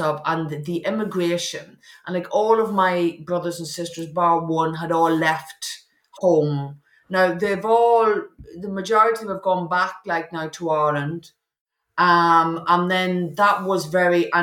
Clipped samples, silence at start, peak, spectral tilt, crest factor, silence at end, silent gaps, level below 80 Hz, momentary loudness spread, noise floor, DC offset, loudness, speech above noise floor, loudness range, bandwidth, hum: under 0.1%; 0 s; -4 dBFS; -5.5 dB/octave; 16 dB; 0 s; 11.61-11.66 s; -64 dBFS; 13 LU; -41 dBFS; under 0.1%; -21 LUFS; 21 dB; 3 LU; 18 kHz; none